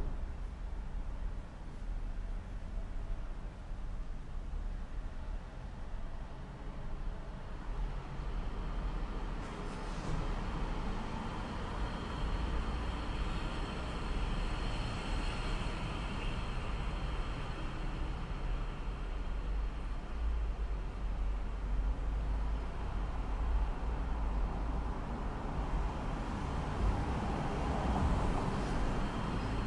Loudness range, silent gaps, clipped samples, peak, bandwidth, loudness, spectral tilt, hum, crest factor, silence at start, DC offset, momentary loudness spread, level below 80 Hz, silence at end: 9 LU; none; under 0.1%; -22 dBFS; 10.5 kHz; -40 LUFS; -6.5 dB/octave; none; 14 dB; 0 s; under 0.1%; 10 LU; -38 dBFS; 0 s